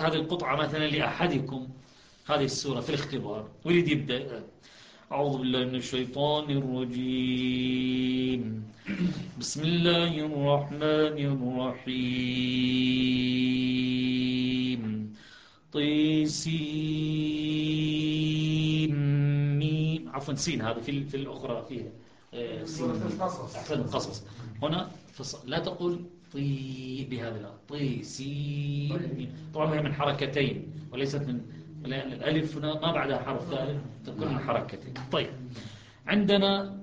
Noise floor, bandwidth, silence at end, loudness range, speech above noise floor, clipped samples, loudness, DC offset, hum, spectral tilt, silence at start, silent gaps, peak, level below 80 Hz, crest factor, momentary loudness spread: -54 dBFS; 9.6 kHz; 0 s; 7 LU; 25 dB; under 0.1%; -29 LUFS; under 0.1%; none; -6 dB/octave; 0 s; none; -10 dBFS; -58 dBFS; 20 dB; 13 LU